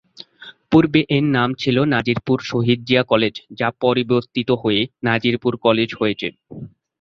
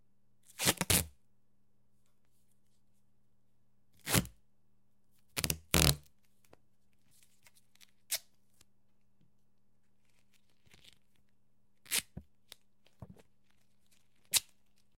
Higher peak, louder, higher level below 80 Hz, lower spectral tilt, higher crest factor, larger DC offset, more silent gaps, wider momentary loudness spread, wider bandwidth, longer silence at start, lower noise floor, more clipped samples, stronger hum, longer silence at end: about the same, -2 dBFS vs -4 dBFS; first, -18 LUFS vs -32 LUFS; about the same, -52 dBFS vs -54 dBFS; first, -7 dB/octave vs -2.5 dB/octave; second, 16 dB vs 36 dB; neither; neither; second, 10 LU vs 21 LU; second, 7.2 kHz vs 16.5 kHz; second, 0.4 s vs 0.6 s; second, -44 dBFS vs -78 dBFS; neither; neither; second, 0.35 s vs 0.55 s